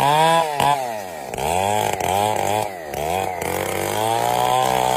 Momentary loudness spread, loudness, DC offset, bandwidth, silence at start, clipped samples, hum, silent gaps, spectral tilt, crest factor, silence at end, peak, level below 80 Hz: 9 LU; -20 LUFS; under 0.1%; 16 kHz; 0 s; under 0.1%; none; none; -3.5 dB/octave; 16 dB; 0 s; -4 dBFS; -48 dBFS